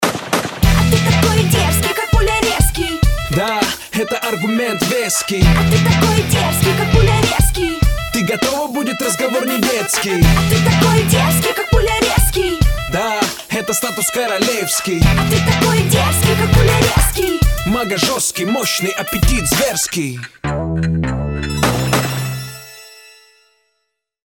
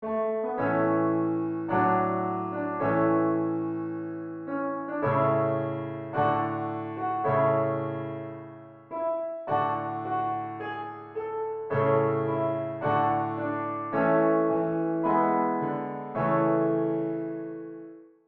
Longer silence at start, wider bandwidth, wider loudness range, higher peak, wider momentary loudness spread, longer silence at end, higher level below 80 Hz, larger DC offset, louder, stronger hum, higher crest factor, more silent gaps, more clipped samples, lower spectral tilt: about the same, 0 s vs 0 s; first, 19 kHz vs 4.2 kHz; about the same, 4 LU vs 4 LU; first, 0 dBFS vs -12 dBFS; second, 6 LU vs 11 LU; first, 1.4 s vs 0.2 s; first, -22 dBFS vs -68 dBFS; neither; first, -15 LUFS vs -28 LUFS; neither; about the same, 14 dB vs 16 dB; neither; neither; second, -4.5 dB/octave vs -7.5 dB/octave